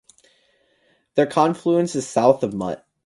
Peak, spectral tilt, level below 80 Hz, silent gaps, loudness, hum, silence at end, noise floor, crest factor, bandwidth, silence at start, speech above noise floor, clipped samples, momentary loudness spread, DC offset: 0 dBFS; -6 dB/octave; -62 dBFS; none; -20 LUFS; none; 0.3 s; -63 dBFS; 22 dB; 11.5 kHz; 1.15 s; 44 dB; under 0.1%; 8 LU; under 0.1%